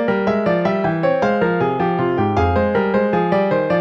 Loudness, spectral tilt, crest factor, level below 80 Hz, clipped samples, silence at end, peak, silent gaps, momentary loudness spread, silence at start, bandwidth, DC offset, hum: -17 LUFS; -8.5 dB/octave; 12 dB; -40 dBFS; under 0.1%; 0 s; -4 dBFS; none; 1 LU; 0 s; 7 kHz; under 0.1%; none